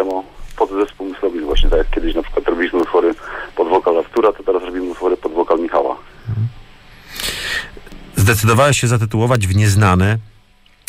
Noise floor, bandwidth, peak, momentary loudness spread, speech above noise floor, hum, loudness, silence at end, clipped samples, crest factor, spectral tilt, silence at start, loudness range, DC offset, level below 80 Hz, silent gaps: -49 dBFS; 16 kHz; -2 dBFS; 12 LU; 36 dB; none; -17 LUFS; 0.6 s; under 0.1%; 14 dB; -5.5 dB/octave; 0 s; 5 LU; under 0.1%; -26 dBFS; none